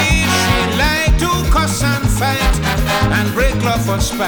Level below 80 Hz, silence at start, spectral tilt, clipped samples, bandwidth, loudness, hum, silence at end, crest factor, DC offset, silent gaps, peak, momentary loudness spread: -20 dBFS; 0 s; -4.5 dB/octave; under 0.1%; over 20 kHz; -15 LUFS; none; 0 s; 14 dB; under 0.1%; none; -2 dBFS; 3 LU